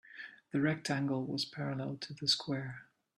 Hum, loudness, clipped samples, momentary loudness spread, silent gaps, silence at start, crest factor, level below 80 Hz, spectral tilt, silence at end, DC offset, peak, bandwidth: none; -35 LUFS; under 0.1%; 15 LU; none; 0.1 s; 20 dB; -76 dBFS; -4.5 dB/octave; 0.35 s; under 0.1%; -18 dBFS; 12.5 kHz